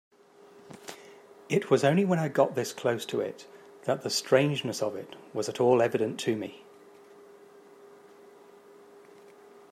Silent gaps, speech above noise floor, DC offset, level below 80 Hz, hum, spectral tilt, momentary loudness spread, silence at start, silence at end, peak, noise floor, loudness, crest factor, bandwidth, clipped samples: none; 28 dB; under 0.1%; -78 dBFS; none; -5 dB/octave; 21 LU; 0.7 s; 1.85 s; -8 dBFS; -56 dBFS; -28 LUFS; 22 dB; 15.5 kHz; under 0.1%